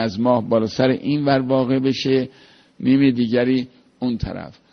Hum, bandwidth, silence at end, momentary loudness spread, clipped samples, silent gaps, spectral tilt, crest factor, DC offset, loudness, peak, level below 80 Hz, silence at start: none; 6.6 kHz; 0.2 s; 11 LU; under 0.1%; none; -7 dB/octave; 16 dB; under 0.1%; -19 LUFS; -4 dBFS; -46 dBFS; 0 s